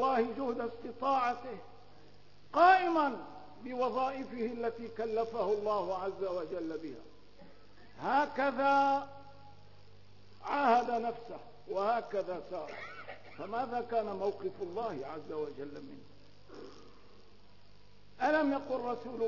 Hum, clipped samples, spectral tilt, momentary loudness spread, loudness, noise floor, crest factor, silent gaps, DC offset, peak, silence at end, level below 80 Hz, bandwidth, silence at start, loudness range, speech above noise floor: 50 Hz at -65 dBFS; under 0.1%; -3 dB/octave; 20 LU; -33 LUFS; -62 dBFS; 22 dB; none; 0.3%; -14 dBFS; 0 s; -70 dBFS; 6 kHz; 0 s; 8 LU; 29 dB